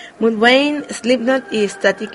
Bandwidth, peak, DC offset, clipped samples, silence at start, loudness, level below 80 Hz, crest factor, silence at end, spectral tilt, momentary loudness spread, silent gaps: 11.5 kHz; 0 dBFS; under 0.1%; under 0.1%; 0 s; -16 LUFS; -60 dBFS; 16 dB; 0 s; -3.5 dB/octave; 8 LU; none